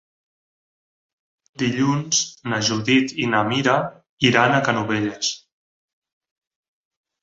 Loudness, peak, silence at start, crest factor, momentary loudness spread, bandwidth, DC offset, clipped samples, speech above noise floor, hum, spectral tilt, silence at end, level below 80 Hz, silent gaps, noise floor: -20 LUFS; -2 dBFS; 1.6 s; 22 dB; 8 LU; 8 kHz; under 0.1%; under 0.1%; over 70 dB; none; -3.5 dB/octave; 1.85 s; -60 dBFS; 4.09-4.17 s; under -90 dBFS